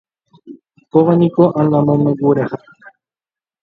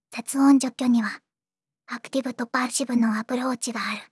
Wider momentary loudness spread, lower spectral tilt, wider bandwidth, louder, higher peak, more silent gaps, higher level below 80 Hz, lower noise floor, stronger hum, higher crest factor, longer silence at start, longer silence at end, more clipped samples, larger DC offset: second, 7 LU vs 12 LU; first, -11.5 dB/octave vs -3.5 dB/octave; second, 4.6 kHz vs 12 kHz; first, -14 LUFS vs -24 LUFS; first, 0 dBFS vs -8 dBFS; neither; first, -56 dBFS vs -84 dBFS; about the same, under -90 dBFS vs under -90 dBFS; neither; about the same, 16 dB vs 16 dB; first, 0.45 s vs 0.1 s; first, 0.75 s vs 0.1 s; neither; neither